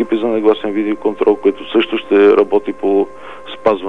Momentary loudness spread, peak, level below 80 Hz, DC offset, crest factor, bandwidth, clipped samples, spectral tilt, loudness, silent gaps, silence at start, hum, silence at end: 8 LU; 0 dBFS; -54 dBFS; 2%; 14 dB; 4.6 kHz; under 0.1%; -6.5 dB/octave; -14 LUFS; none; 0 s; none; 0 s